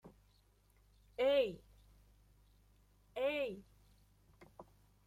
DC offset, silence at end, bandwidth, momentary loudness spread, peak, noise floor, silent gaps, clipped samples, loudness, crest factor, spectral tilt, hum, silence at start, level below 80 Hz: under 0.1%; 0.45 s; 13.5 kHz; 24 LU; -22 dBFS; -71 dBFS; none; under 0.1%; -37 LUFS; 20 dB; -5 dB/octave; 50 Hz at -65 dBFS; 0.05 s; -68 dBFS